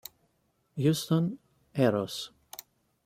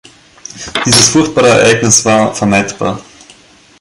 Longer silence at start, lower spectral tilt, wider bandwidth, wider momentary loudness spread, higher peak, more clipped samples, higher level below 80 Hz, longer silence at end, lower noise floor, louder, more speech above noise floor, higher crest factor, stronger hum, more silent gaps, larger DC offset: first, 0.75 s vs 0.55 s; first, -6 dB/octave vs -3 dB/octave; about the same, 16.5 kHz vs 16 kHz; first, 19 LU vs 15 LU; second, -12 dBFS vs 0 dBFS; second, under 0.1% vs 0.2%; second, -68 dBFS vs -42 dBFS; about the same, 0.8 s vs 0.8 s; first, -73 dBFS vs -42 dBFS; second, -29 LUFS vs -9 LUFS; first, 45 dB vs 33 dB; first, 20 dB vs 12 dB; neither; neither; neither